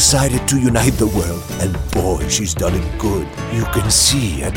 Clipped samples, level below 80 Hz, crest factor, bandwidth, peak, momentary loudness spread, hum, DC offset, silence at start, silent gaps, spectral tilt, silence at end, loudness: under 0.1%; -26 dBFS; 16 dB; 16.5 kHz; 0 dBFS; 10 LU; none; under 0.1%; 0 s; none; -4 dB/octave; 0 s; -16 LUFS